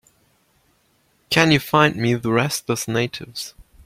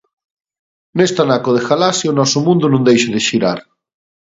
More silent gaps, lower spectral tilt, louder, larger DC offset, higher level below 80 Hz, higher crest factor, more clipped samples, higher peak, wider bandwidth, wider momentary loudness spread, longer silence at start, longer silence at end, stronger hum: neither; about the same, -4.5 dB/octave vs -4.5 dB/octave; second, -19 LUFS vs -14 LUFS; neither; about the same, -54 dBFS vs -56 dBFS; first, 20 dB vs 14 dB; neither; about the same, 0 dBFS vs 0 dBFS; first, 16.5 kHz vs 8 kHz; first, 15 LU vs 5 LU; first, 1.3 s vs 0.95 s; second, 0.35 s vs 0.7 s; neither